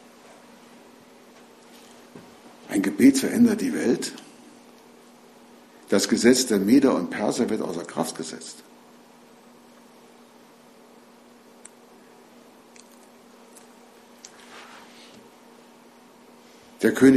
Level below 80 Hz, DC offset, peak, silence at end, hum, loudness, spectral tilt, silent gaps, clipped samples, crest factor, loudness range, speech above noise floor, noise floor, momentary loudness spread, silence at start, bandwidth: -66 dBFS; under 0.1%; -4 dBFS; 0 s; none; -22 LUFS; -4.5 dB/octave; none; under 0.1%; 22 dB; 12 LU; 31 dB; -52 dBFS; 28 LU; 2.15 s; 14 kHz